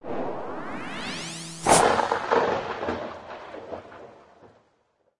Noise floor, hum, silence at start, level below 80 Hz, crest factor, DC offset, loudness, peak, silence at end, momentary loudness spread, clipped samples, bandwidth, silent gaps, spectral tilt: -69 dBFS; none; 0.05 s; -56 dBFS; 24 dB; under 0.1%; -25 LUFS; -4 dBFS; 0 s; 21 LU; under 0.1%; 11.5 kHz; none; -3 dB/octave